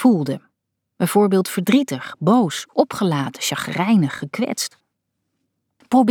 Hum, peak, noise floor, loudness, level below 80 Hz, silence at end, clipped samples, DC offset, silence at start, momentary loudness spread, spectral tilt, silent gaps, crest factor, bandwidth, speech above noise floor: none; -4 dBFS; -76 dBFS; -20 LUFS; -68 dBFS; 0 s; under 0.1%; under 0.1%; 0 s; 8 LU; -5.5 dB/octave; none; 16 dB; 19 kHz; 58 dB